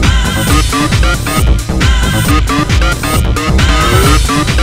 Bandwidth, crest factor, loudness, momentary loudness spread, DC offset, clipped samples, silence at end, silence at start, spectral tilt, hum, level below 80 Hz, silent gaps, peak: 16.5 kHz; 10 dB; -11 LUFS; 3 LU; 0.4%; 0.4%; 0 s; 0 s; -4.5 dB/octave; none; -14 dBFS; none; 0 dBFS